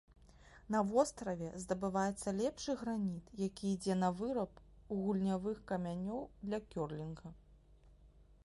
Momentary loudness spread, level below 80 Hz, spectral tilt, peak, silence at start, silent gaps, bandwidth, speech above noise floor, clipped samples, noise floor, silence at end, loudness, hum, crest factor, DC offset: 9 LU; -62 dBFS; -6 dB/octave; -18 dBFS; 0.35 s; none; 11.5 kHz; 25 dB; under 0.1%; -63 dBFS; 0.2 s; -39 LUFS; none; 20 dB; under 0.1%